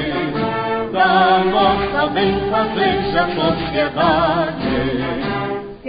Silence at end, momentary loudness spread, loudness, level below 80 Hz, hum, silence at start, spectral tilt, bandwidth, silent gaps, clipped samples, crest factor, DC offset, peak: 0 s; 7 LU; -17 LUFS; -38 dBFS; none; 0 s; -11 dB/octave; 5.2 kHz; none; under 0.1%; 14 dB; under 0.1%; -2 dBFS